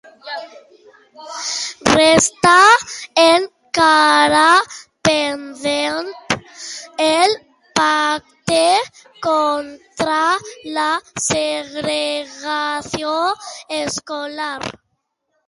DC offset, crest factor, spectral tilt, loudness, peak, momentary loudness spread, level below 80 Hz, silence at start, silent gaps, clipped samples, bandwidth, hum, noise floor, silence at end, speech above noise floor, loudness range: under 0.1%; 18 dB; -2.5 dB/octave; -16 LUFS; 0 dBFS; 15 LU; -52 dBFS; 0.25 s; none; under 0.1%; 11.5 kHz; none; -71 dBFS; 0.75 s; 55 dB; 8 LU